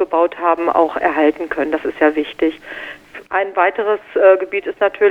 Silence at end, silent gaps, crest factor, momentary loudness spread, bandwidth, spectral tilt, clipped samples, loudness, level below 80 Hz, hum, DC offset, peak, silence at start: 0 s; none; 16 dB; 12 LU; 6.6 kHz; -5.5 dB/octave; under 0.1%; -16 LUFS; -54 dBFS; none; under 0.1%; 0 dBFS; 0 s